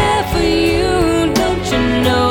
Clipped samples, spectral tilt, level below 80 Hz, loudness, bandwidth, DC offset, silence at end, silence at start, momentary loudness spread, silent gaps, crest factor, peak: under 0.1%; -5 dB/octave; -28 dBFS; -14 LUFS; 18 kHz; under 0.1%; 0 s; 0 s; 2 LU; none; 12 dB; -2 dBFS